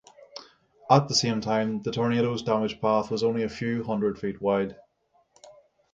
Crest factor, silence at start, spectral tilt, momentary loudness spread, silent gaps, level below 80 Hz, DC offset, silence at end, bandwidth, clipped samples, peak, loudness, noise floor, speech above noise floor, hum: 22 dB; 0.2 s; -5 dB/octave; 17 LU; none; -60 dBFS; under 0.1%; 0.45 s; 9.2 kHz; under 0.1%; -4 dBFS; -26 LUFS; -68 dBFS; 42 dB; none